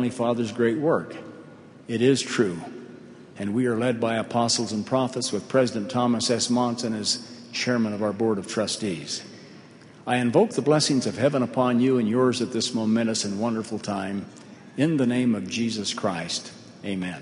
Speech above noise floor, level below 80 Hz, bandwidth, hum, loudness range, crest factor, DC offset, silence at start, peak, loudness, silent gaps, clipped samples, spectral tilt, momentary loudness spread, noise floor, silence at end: 24 dB; -64 dBFS; 11 kHz; none; 4 LU; 20 dB; under 0.1%; 0 s; -6 dBFS; -24 LUFS; none; under 0.1%; -4.5 dB/octave; 13 LU; -47 dBFS; 0 s